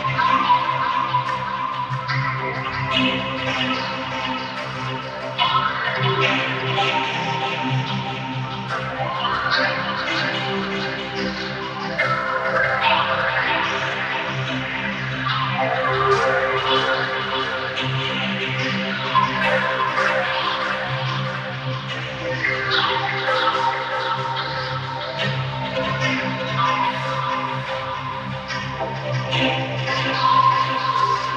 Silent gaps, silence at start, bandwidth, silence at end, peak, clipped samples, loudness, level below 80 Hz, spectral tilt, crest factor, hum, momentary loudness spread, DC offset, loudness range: none; 0 s; 8.6 kHz; 0 s; -4 dBFS; under 0.1%; -21 LUFS; -52 dBFS; -5 dB/octave; 18 dB; none; 8 LU; under 0.1%; 2 LU